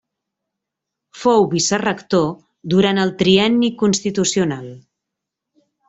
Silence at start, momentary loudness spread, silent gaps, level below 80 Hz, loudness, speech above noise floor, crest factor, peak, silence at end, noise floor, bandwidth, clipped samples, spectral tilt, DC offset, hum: 1.15 s; 9 LU; none; -56 dBFS; -17 LUFS; 65 dB; 18 dB; -2 dBFS; 1.1 s; -82 dBFS; 8.2 kHz; under 0.1%; -4.5 dB/octave; under 0.1%; none